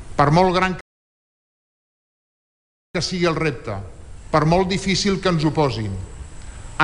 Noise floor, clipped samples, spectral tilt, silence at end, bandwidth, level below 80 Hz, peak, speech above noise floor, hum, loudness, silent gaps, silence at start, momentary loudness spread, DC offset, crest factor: under -90 dBFS; under 0.1%; -5.5 dB/octave; 0 s; 11 kHz; -38 dBFS; -4 dBFS; over 71 dB; none; -20 LUFS; 0.81-2.94 s; 0 s; 19 LU; under 0.1%; 18 dB